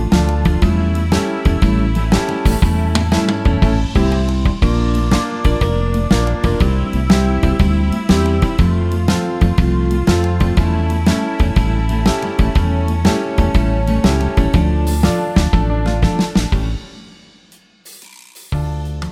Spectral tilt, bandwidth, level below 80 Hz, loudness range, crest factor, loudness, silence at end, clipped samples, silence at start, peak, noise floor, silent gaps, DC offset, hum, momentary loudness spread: -6.5 dB/octave; 15.5 kHz; -18 dBFS; 2 LU; 14 dB; -16 LUFS; 0 s; under 0.1%; 0 s; 0 dBFS; -48 dBFS; none; under 0.1%; none; 3 LU